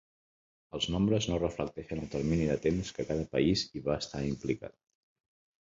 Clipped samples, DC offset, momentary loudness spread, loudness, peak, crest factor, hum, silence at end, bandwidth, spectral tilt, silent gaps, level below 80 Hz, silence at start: under 0.1%; under 0.1%; 9 LU; -32 LUFS; -14 dBFS; 18 dB; none; 1.05 s; 7.8 kHz; -6 dB/octave; none; -50 dBFS; 0.75 s